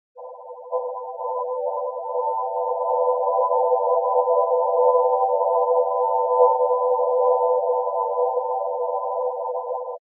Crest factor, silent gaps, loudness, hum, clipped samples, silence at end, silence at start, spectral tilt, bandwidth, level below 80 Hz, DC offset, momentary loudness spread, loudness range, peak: 16 dB; none; -22 LUFS; none; under 0.1%; 0.05 s; 0.15 s; -7.5 dB/octave; 1.2 kHz; under -90 dBFS; under 0.1%; 10 LU; 4 LU; -6 dBFS